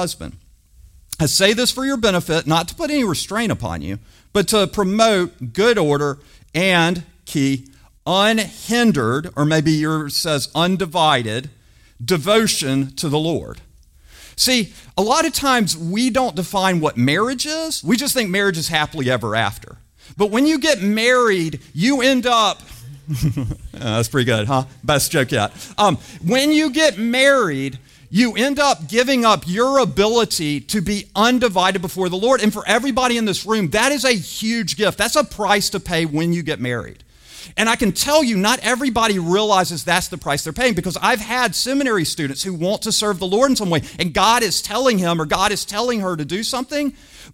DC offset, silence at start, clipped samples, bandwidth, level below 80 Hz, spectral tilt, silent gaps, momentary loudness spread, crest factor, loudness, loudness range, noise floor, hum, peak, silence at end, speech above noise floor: under 0.1%; 0 s; under 0.1%; 16.5 kHz; -44 dBFS; -4 dB/octave; none; 8 LU; 18 dB; -18 LUFS; 2 LU; -48 dBFS; none; -2 dBFS; 0.05 s; 30 dB